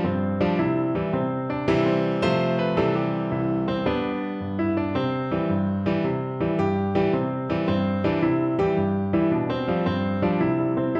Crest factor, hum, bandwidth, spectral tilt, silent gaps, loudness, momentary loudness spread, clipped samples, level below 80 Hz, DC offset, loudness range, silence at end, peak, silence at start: 14 dB; none; 7.4 kHz; -8.5 dB/octave; none; -24 LUFS; 3 LU; under 0.1%; -48 dBFS; under 0.1%; 2 LU; 0 s; -10 dBFS; 0 s